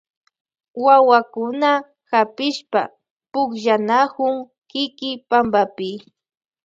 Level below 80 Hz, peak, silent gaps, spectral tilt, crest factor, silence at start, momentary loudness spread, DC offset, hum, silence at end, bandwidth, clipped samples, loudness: -64 dBFS; -2 dBFS; 3.11-3.20 s, 4.58-4.62 s; -4.5 dB/octave; 18 dB; 0.75 s; 15 LU; under 0.1%; none; 0.65 s; 7.8 kHz; under 0.1%; -19 LUFS